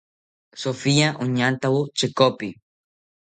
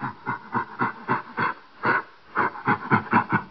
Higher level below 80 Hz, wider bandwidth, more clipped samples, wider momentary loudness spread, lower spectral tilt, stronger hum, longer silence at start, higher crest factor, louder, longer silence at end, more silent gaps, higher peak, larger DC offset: about the same, -62 dBFS vs -66 dBFS; first, 9.4 kHz vs 6 kHz; neither; first, 11 LU vs 8 LU; about the same, -5 dB/octave vs -4.5 dB/octave; neither; first, 0.55 s vs 0 s; about the same, 20 dB vs 20 dB; first, -21 LUFS vs -25 LUFS; first, 0.8 s vs 0 s; neither; about the same, -4 dBFS vs -6 dBFS; second, under 0.1% vs 0.2%